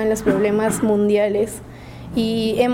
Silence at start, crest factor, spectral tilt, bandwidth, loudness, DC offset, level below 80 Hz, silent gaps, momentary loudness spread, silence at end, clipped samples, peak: 0 s; 14 dB; -5.5 dB/octave; 16.5 kHz; -19 LUFS; under 0.1%; -44 dBFS; none; 15 LU; 0 s; under 0.1%; -4 dBFS